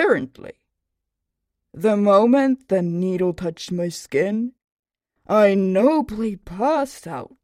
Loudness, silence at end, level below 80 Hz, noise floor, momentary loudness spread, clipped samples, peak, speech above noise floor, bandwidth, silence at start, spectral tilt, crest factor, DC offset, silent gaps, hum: -20 LUFS; 0.2 s; -54 dBFS; -80 dBFS; 13 LU; under 0.1%; -4 dBFS; 61 dB; 15 kHz; 0 s; -6.5 dB/octave; 18 dB; under 0.1%; 4.64-4.83 s; none